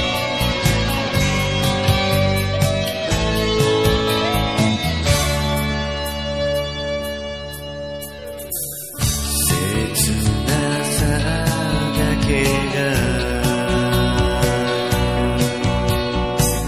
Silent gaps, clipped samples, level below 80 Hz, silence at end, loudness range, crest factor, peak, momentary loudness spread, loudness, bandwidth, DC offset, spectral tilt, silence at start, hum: none; under 0.1%; -28 dBFS; 0 s; 5 LU; 16 dB; -2 dBFS; 7 LU; -19 LUFS; 15.5 kHz; 0.4%; -4.5 dB/octave; 0 s; none